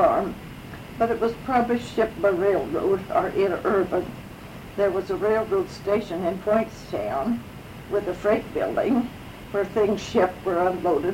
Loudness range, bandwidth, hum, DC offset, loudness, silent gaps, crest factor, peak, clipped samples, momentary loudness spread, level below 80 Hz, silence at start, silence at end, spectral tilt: 2 LU; 16.5 kHz; none; under 0.1%; -24 LUFS; none; 18 dB; -6 dBFS; under 0.1%; 13 LU; -48 dBFS; 0 s; 0 s; -6.5 dB/octave